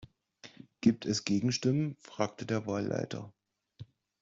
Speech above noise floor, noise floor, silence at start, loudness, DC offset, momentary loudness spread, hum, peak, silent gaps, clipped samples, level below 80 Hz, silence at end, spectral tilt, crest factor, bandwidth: 26 dB; -57 dBFS; 0 s; -32 LUFS; under 0.1%; 24 LU; none; -12 dBFS; none; under 0.1%; -70 dBFS; 0.35 s; -5.5 dB/octave; 22 dB; 7.8 kHz